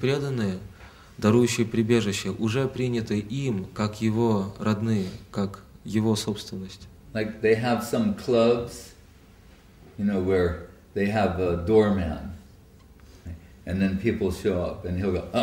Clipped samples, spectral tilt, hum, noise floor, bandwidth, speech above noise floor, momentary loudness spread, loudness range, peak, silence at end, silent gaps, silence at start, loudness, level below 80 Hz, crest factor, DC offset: under 0.1%; -6.5 dB/octave; none; -51 dBFS; 16 kHz; 27 dB; 18 LU; 3 LU; -8 dBFS; 0 s; none; 0 s; -26 LUFS; -48 dBFS; 18 dB; under 0.1%